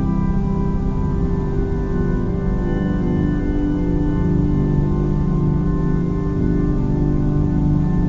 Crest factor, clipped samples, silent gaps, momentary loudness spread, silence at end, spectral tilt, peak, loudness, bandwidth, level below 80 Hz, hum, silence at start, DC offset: 12 dB; under 0.1%; none; 3 LU; 0 s; -10.5 dB/octave; -4 dBFS; -20 LUFS; 7 kHz; -22 dBFS; none; 0 s; under 0.1%